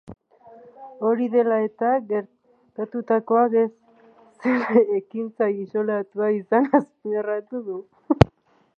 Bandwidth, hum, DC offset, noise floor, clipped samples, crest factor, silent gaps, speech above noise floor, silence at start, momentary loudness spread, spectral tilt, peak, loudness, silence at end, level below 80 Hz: 7.2 kHz; none; under 0.1%; -57 dBFS; under 0.1%; 22 dB; none; 35 dB; 0.1 s; 12 LU; -9 dB/octave; 0 dBFS; -22 LUFS; 0.5 s; -46 dBFS